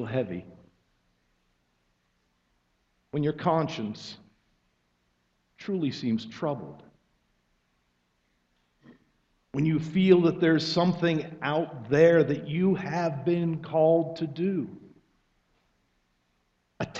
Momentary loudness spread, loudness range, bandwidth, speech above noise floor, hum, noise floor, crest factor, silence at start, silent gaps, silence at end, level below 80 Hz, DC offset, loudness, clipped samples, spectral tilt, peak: 16 LU; 13 LU; 7.6 kHz; 47 dB; 60 Hz at -55 dBFS; -73 dBFS; 22 dB; 0 s; none; 0 s; -66 dBFS; under 0.1%; -26 LUFS; under 0.1%; -7.5 dB/octave; -6 dBFS